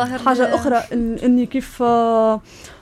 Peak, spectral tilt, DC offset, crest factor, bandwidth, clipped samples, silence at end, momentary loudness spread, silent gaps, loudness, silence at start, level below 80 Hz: -4 dBFS; -5.5 dB/octave; under 0.1%; 14 dB; 13.5 kHz; under 0.1%; 0.05 s; 6 LU; none; -18 LUFS; 0 s; -42 dBFS